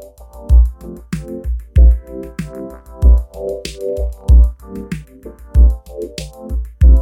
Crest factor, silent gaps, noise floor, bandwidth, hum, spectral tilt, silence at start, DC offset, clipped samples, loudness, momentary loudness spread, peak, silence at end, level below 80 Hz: 12 dB; none; -36 dBFS; 9.8 kHz; none; -7.5 dB/octave; 0 s; under 0.1%; under 0.1%; -17 LUFS; 18 LU; 0 dBFS; 0 s; -14 dBFS